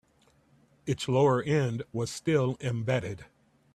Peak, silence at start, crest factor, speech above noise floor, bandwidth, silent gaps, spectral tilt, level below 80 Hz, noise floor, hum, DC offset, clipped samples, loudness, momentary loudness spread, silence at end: -12 dBFS; 0.85 s; 16 dB; 37 dB; 13 kHz; none; -6.5 dB/octave; -62 dBFS; -65 dBFS; none; under 0.1%; under 0.1%; -29 LUFS; 13 LU; 0.5 s